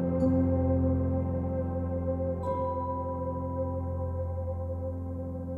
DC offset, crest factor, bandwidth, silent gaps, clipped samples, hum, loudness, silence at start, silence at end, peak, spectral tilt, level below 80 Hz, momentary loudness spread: under 0.1%; 14 dB; 2.3 kHz; none; under 0.1%; none; -31 LUFS; 0 s; 0 s; -16 dBFS; -12 dB/octave; -42 dBFS; 8 LU